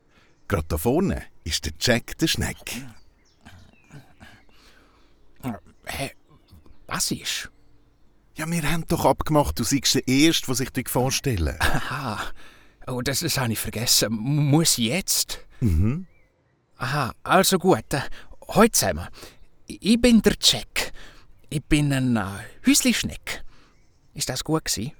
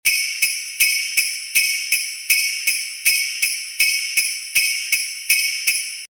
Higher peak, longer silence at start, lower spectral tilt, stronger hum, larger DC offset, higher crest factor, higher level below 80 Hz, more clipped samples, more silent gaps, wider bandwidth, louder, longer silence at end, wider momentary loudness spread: about the same, -2 dBFS vs -2 dBFS; first, 0.5 s vs 0.05 s; first, -4 dB/octave vs 5 dB/octave; neither; neither; about the same, 22 dB vs 20 dB; first, -38 dBFS vs -60 dBFS; neither; neither; about the same, over 20 kHz vs over 20 kHz; second, -23 LUFS vs -18 LUFS; about the same, 0.05 s vs 0.05 s; first, 15 LU vs 4 LU